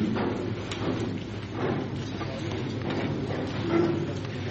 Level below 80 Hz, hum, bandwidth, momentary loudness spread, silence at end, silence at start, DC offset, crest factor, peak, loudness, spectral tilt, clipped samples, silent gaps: -52 dBFS; none; 8.2 kHz; 7 LU; 0 s; 0 s; under 0.1%; 18 dB; -12 dBFS; -30 LUFS; -7 dB/octave; under 0.1%; none